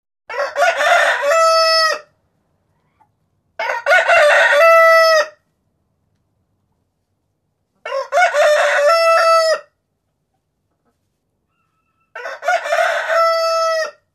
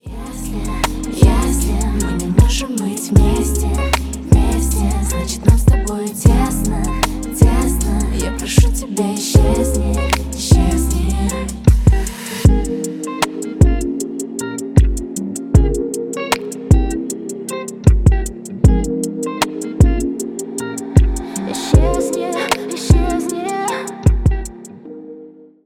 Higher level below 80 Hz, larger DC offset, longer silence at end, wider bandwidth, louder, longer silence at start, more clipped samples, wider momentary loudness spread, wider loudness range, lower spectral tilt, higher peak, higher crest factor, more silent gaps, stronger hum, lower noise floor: second, -68 dBFS vs -18 dBFS; neither; about the same, 0.25 s vs 0.35 s; second, 14 kHz vs 16.5 kHz; first, -13 LUFS vs -17 LUFS; first, 0.3 s vs 0.05 s; neither; first, 15 LU vs 10 LU; first, 10 LU vs 2 LU; second, 1.5 dB/octave vs -5.5 dB/octave; about the same, -2 dBFS vs 0 dBFS; about the same, 14 dB vs 14 dB; neither; neither; first, -70 dBFS vs -39 dBFS